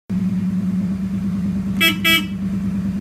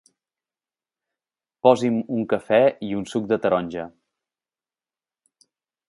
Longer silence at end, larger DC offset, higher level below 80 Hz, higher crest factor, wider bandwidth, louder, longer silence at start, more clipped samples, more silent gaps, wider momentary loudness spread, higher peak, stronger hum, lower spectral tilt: second, 0 s vs 2 s; neither; first, -40 dBFS vs -64 dBFS; second, 16 dB vs 24 dB; first, 15.5 kHz vs 11.5 kHz; about the same, -19 LUFS vs -21 LUFS; second, 0.1 s vs 1.65 s; neither; neither; second, 8 LU vs 12 LU; second, -4 dBFS vs 0 dBFS; neither; second, -4.5 dB/octave vs -6.5 dB/octave